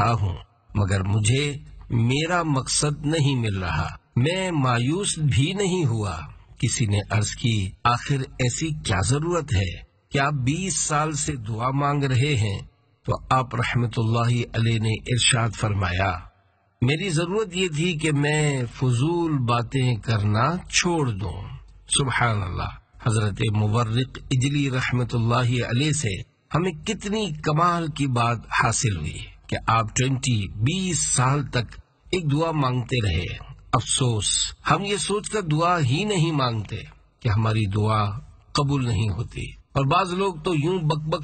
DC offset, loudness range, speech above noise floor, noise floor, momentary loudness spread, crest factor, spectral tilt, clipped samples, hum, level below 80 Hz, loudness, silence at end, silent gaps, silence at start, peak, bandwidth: under 0.1%; 1 LU; 40 dB; -62 dBFS; 8 LU; 20 dB; -4.5 dB/octave; under 0.1%; none; -44 dBFS; -23 LUFS; 0 s; none; 0 s; -4 dBFS; 9.2 kHz